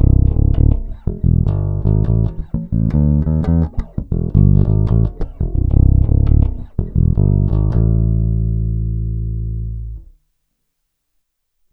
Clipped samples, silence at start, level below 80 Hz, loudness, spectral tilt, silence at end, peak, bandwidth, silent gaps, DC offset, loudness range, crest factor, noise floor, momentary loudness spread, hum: under 0.1%; 0 s; -18 dBFS; -17 LUFS; -13 dB/octave; 1.7 s; 0 dBFS; 2.2 kHz; none; under 0.1%; 5 LU; 14 dB; -71 dBFS; 11 LU; none